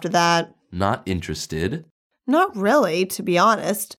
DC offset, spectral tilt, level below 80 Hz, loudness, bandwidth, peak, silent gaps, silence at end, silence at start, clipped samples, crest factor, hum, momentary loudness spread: under 0.1%; -4.5 dB/octave; -50 dBFS; -21 LUFS; 17.5 kHz; -4 dBFS; 1.91-2.10 s; 0.05 s; 0 s; under 0.1%; 16 dB; none; 10 LU